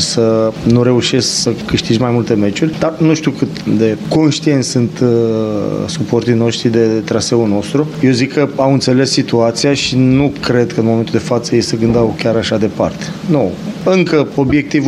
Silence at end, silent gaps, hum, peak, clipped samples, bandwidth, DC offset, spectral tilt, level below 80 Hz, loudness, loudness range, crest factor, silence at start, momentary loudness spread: 0 s; none; none; 0 dBFS; under 0.1%; 13 kHz; under 0.1%; -5.5 dB/octave; -40 dBFS; -13 LUFS; 2 LU; 12 dB; 0 s; 4 LU